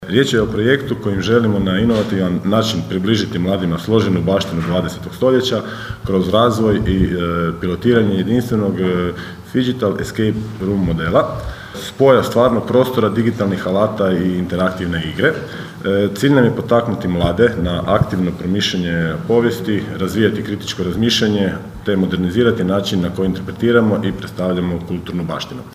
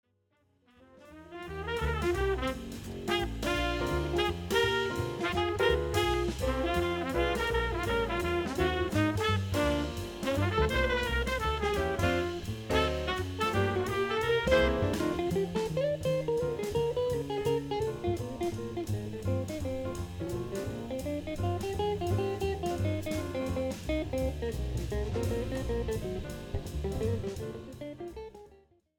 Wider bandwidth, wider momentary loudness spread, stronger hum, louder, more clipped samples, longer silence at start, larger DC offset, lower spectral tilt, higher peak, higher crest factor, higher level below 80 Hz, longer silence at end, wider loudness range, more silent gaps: second, 15.5 kHz vs 19.5 kHz; about the same, 8 LU vs 8 LU; neither; first, -17 LUFS vs -32 LUFS; neither; second, 0 s vs 0.95 s; neither; about the same, -6.5 dB/octave vs -5.5 dB/octave; first, 0 dBFS vs -12 dBFS; about the same, 16 dB vs 18 dB; about the same, -38 dBFS vs -42 dBFS; second, 0 s vs 0.45 s; second, 2 LU vs 5 LU; neither